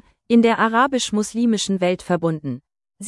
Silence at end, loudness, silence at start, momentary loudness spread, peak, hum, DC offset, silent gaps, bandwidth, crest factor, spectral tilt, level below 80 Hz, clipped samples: 0 s; -19 LUFS; 0.3 s; 10 LU; -4 dBFS; none; under 0.1%; none; 12 kHz; 16 dB; -4.5 dB/octave; -58 dBFS; under 0.1%